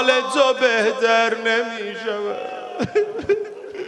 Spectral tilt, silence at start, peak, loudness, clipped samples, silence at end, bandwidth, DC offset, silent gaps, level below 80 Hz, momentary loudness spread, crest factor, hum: -3 dB/octave; 0 s; -2 dBFS; -20 LUFS; under 0.1%; 0 s; 11 kHz; under 0.1%; none; -58 dBFS; 10 LU; 18 dB; none